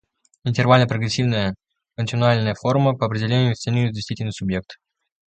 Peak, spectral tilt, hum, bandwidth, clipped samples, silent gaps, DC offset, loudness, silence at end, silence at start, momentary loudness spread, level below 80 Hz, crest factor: 0 dBFS; -6.5 dB/octave; none; 8.8 kHz; under 0.1%; none; under 0.1%; -21 LUFS; 0.55 s; 0.45 s; 12 LU; -50 dBFS; 20 dB